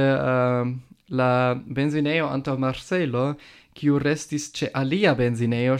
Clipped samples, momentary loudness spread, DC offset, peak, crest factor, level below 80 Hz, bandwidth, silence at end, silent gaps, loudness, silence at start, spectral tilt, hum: under 0.1%; 8 LU; under 0.1%; -6 dBFS; 16 dB; -54 dBFS; 11.5 kHz; 0 s; none; -23 LUFS; 0 s; -6.5 dB/octave; none